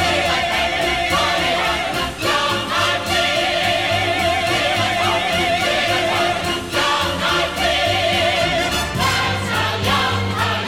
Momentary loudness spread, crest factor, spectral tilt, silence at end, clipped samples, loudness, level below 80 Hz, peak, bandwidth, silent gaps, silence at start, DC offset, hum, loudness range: 3 LU; 14 dB; -3.5 dB/octave; 0 s; under 0.1%; -17 LUFS; -40 dBFS; -6 dBFS; 17.5 kHz; none; 0 s; 0.3%; none; 1 LU